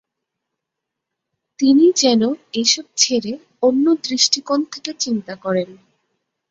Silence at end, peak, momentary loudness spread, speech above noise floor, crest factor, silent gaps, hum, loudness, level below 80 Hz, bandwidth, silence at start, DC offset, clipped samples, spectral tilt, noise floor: 0.75 s; 0 dBFS; 11 LU; 64 dB; 18 dB; none; none; -17 LUFS; -66 dBFS; 8 kHz; 1.6 s; under 0.1%; under 0.1%; -3 dB/octave; -81 dBFS